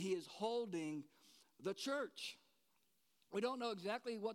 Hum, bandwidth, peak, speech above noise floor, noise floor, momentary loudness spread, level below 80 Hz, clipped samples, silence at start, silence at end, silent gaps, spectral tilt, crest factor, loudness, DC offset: none; 16.5 kHz; -28 dBFS; 38 dB; -82 dBFS; 8 LU; under -90 dBFS; under 0.1%; 0 s; 0 s; none; -4.5 dB/octave; 18 dB; -45 LUFS; under 0.1%